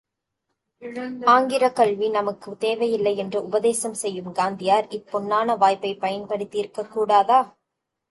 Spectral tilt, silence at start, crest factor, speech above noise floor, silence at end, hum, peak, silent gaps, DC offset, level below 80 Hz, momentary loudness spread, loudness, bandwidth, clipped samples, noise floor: -4 dB/octave; 0.8 s; 18 dB; 59 dB; 0.65 s; none; -4 dBFS; none; under 0.1%; -70 dBFS; 12 LU; -22 LUFS; 11.5 kHz; under 0.1%; -81 dBFS